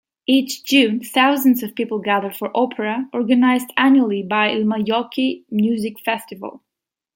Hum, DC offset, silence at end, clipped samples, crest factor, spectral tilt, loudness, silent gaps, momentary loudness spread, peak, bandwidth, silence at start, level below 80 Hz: none; under 0.1%; 0.6 s; under 0.1%; 18 dB; -4.5 dB/octave; -18 LUFS; none; 9 LU; -2 dBFS; 17 kHz; 0.3 s; -68 dBFS